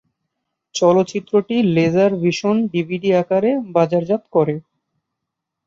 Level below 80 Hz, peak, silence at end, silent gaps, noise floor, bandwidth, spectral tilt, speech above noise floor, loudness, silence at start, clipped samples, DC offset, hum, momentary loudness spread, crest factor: -62 dBFS; -2 dBFS; 1.05 s; none; -80 dBFS; 7.8 kHz; -6.5 dB/octave; 64 dB; -17 LUFS; 0.75 s; under 0.1%; under 0.1%; none; 5 LU; 16 dB